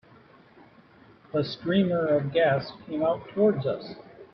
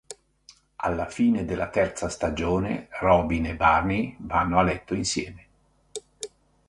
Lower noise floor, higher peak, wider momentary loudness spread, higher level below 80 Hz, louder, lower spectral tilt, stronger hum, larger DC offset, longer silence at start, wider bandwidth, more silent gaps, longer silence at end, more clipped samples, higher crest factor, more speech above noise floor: second, -55 dBFS vs -63 dBFS; second, -12 dBFS vs -6 dBFS; second, 11 LU vs 18 LU; second, -64 dBFS vs -42 dBFS; about the same, -26 LUFS vs -25 LUFS; first, -9 dB/octave vs -5.5 dB/octave; neither; neither; first, 1.35 s vs 0.1 s; second, 6 kHz vs 11.5 kHz; neither; second, 0.1 s vs 0.4 s; neither; about the same, 16 dB vs 20 dB; second, 29 dB vs 39 dB